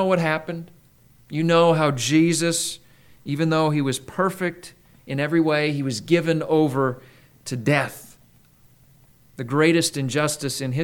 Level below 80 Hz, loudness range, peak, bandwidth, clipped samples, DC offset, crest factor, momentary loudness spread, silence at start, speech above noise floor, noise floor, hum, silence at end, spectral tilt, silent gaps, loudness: -62 dBFS; 4 LU; -4 dBFS; 19 kHz; under 0.1%; under 0.1%; 18 dB; 15 LU; 0 s; 33 dB; -55 dBFS; none; 0 s; -5 dB/octave; none; -22 LUFS